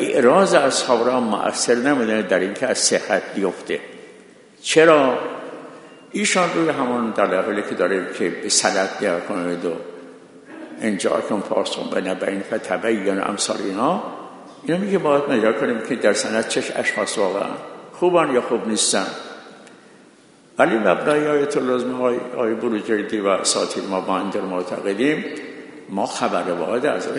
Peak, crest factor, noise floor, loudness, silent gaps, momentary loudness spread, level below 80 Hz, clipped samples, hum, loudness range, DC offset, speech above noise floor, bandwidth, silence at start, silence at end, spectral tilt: 0 dBFS; 20 dB; -50 dBFS; -20 LUFS; none; 13 LU; -68 dBFS; under 0.1%; none; 4 LU; under 0.1%; 30 dB; 11 kHz; 0 s; 0 s; -3.5 dB/octave